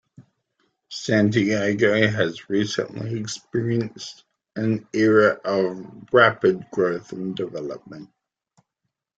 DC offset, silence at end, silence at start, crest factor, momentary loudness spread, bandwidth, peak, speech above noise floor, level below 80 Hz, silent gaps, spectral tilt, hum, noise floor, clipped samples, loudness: under 0.1%; 1.15 s; 0.2 s; 20 dB; 19 LU; 9 kHz; -2 dBFS; 59 dB; -62 dBFS; none; -5.5 dB/octave; none; -80 dBFS; under 0.1%; -22 LUFS